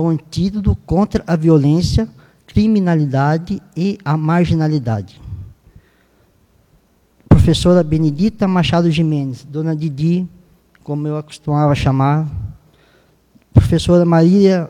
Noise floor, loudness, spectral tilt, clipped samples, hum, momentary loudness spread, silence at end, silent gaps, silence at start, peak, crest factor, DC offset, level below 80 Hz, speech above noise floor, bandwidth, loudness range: -55 dBFS; -15 LUFS; -7.5 dB/octave; under 0.1%; none; 13 LU; 0 s; none; 0 s; 0 dBFS; 16 dB; under 0.1%; -32 dBFS; 41 dB; 11 kHz; 5 LU